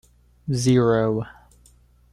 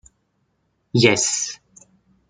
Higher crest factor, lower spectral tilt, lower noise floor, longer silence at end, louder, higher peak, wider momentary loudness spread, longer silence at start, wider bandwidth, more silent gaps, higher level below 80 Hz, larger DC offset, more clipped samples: second, 16 dB vs 22 dB; first, -6.5 dB/octave vs -3.5 dB/octave; second, -55 dBFS vs -69 dBFS; about the same, 0.85 s vs 0.75 s; second, -21 LUFS vs -18 LUFS; second, -8 dBFS vs -2 dBFS; first, 18 LU vs 14 LU; second, 0.45 s vs 0.95 s; first, 13 kHz vs 9.6 kHz; neither; first, -52 dBFS vs -58 dBFS; neither; neither